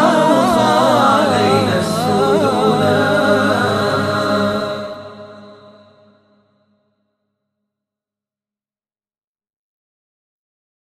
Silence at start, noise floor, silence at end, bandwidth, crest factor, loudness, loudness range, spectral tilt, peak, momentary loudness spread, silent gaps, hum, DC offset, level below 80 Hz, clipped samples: 0 s; under -90 dBFS; 5.45 s; 15 kHz; 16 dB; -14 LUFS; 12 LU; -5.5 dB/octave; 0 dBFS; 9 LU; none; none; under 0.1%; -52 dBFS; under 0.1%